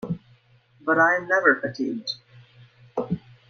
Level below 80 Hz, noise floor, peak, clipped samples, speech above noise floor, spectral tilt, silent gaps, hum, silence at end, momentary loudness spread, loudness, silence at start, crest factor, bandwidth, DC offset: -62 dBFS; -58 dBFS; -4 dBFS; under 0.1%; 36 dB; -5.5 dB/octave; none; none; 0.3 s; 15 LU; -23 LUFS; 0 s; 22 dB; 7 kHz; under 0.1%